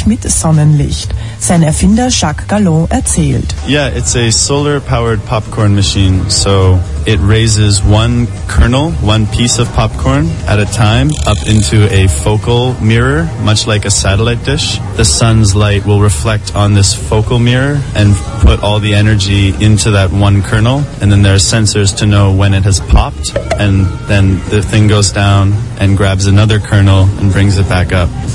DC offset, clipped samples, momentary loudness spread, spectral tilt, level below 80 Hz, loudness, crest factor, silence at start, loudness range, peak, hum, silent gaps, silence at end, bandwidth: 1%; 0.3%; 4 LU; -5 dB/octave; -20 dBFS; -10 LUFS; 8 dB; 0 s; 2 LU; 0 dBFS; none; none; 0 s; 11.5 kHz